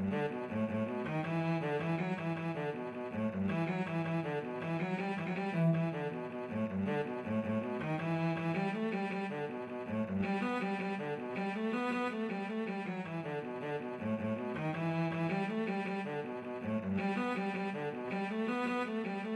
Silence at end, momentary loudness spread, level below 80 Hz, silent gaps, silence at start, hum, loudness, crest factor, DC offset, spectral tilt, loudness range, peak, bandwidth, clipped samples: 0 s; 5 LU; -76 dBFS; none; 0 s; none; -37 LUFS; 16 dB; under 0.1%; -8 dB/octave; 2 LU; -20 dBFS; 10.5 kHz; under 0.1%